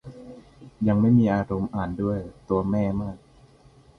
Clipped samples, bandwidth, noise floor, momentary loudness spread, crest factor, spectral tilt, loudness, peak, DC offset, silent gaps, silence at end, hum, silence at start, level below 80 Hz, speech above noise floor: under 0.1%; 6.4 kHz; -54 dBFS; 24 LU; 16 dB; -10 dB/octave; -24 LUFS; -8 dBFS; under 0.1%; none; 0.8 s; none; 0.05 s; -48 dBFS; 31 dB